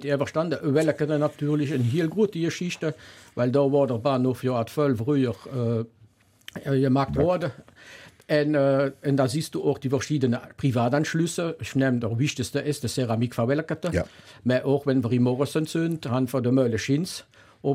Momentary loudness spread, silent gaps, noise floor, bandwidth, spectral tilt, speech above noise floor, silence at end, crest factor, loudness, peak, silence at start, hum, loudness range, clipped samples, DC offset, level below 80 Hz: 7 LU; none; -58 dBFS; 16 kHz; -6.5 dB/octave; 33 dB; 0 s; 16 dB; -25 LUFS; -8 dBFS; 0 s; none; 2 LU; under 0.1%; under 0.1%; -54 dBFS